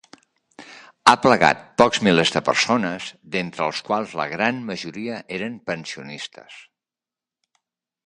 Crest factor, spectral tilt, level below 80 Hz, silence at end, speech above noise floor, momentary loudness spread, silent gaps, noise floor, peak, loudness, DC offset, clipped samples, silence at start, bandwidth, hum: 22 dB; -4 dB/octave; -60 dBFS; 1.45 s; 69 dB; 16 LU; none; -90 dBFS; -2 dBFS; -20 LUFS; under 0.1%; under 0.1%; 0.6 s; 11.5 kHz; none